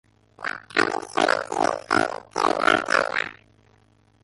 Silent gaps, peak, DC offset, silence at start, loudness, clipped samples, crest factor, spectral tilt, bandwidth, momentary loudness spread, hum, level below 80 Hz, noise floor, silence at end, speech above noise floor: none; -4 dBFS; under 0.1%; 0.4 s; -23 LUFS; under 0.1%; 22 dB; -3 dB/octave; 11.5 kHz; 12 LU; none; -62 dBFS; -59 dBFS; 0.9 s; 35 dB